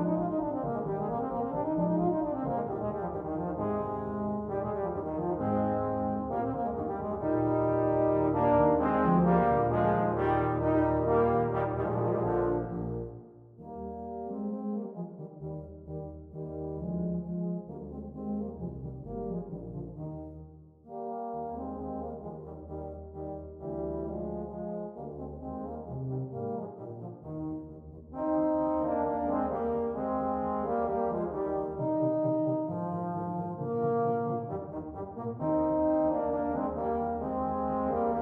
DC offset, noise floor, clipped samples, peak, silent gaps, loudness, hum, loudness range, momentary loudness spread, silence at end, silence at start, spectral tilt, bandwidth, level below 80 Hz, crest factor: under 0.1%; -51 dBFS; under 0.1%; -12 dBFS; none; -32 LUFS; none; 13 LU; 15 LU; 0 s; 0 s; -11.5 dB/octave; 3.9 kHz; -52 dBFS; 18 dB